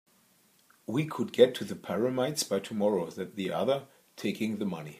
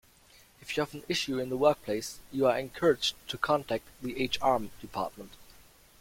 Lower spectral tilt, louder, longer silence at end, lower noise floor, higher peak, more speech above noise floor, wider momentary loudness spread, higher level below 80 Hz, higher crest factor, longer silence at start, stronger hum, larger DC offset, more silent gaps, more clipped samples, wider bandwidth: about the same, -5 dB/octave vs -4 dB/octave; about the same, -30 LUFS vs -30 LUFS; second, 0 s vs 0.5 s; first, -65 dBFS vs -59 dBFS; about the same, -8 dBFS vs -10 dBFS; first, 36 dB vs 29 dB; about the same, 11 LU vs 11 LU; second, -78 dBFS vs -60 dBFS; about the same, 24 dB vs 20 dB; first, 0.9 s vs 0.65 s; neither; neither; neither; neither; about the same, 15.5 kHz vs 16.5 kHz